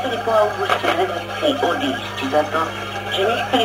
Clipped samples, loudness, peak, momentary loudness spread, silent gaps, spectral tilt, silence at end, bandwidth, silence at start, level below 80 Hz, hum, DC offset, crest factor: under 0.1%; -20 LUFS; -2 dBFS; 5 LU; none; -4 dB/octave; 0 s; 16 kHz; 0 s; -52 dBFS; 50 Hz at -40 dBFS; under 0.1%; 16 dB